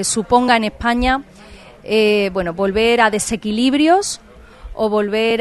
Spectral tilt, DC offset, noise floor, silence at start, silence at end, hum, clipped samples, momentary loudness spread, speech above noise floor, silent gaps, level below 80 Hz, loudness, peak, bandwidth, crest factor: -3.5 dB/octave; under 0.1%; -36 dBFS; 0 s; 0 s; none; under 0.1%; 9 LU; 20 dB; none; -38 dBFS; -16 LUFS; 0 dBFS; 12.5 kHz; 16 dB